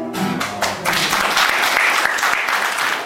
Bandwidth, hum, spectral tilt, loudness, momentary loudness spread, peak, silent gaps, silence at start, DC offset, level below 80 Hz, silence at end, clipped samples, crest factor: 16.5 kHz; none; -1.5 dB/octave; -16 LUFS; 7 LU; -2 dBFS; none; 0 s; under 0.1%; -52 dBFS; 0 s; under 0.1%; 16 dB